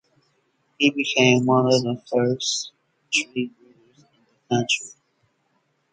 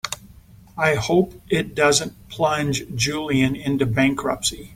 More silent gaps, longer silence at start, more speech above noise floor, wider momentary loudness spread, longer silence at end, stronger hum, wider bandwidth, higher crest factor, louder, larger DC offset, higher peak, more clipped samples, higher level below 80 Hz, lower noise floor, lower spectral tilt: neither; first, 0.8 s vs 0.05 s; first, 48 dB vs 26 dB; first, 12 LU vs 7 LU; first, 1.05 s vs 0 s; neither; second, 9.4 kHz vs 16.5 kHz; about the same, 20 dB vs 18 dB; about the same, -21 LUFS vs -21 LUFS; neither; about the same, -4 dBFS vs -4 dBFS; neither; second, -66 dBFS vs -46 dBFS; first, -69 dBFS vs -47 dBFS; about the same, -4 dB/octave vs -4 dB/octave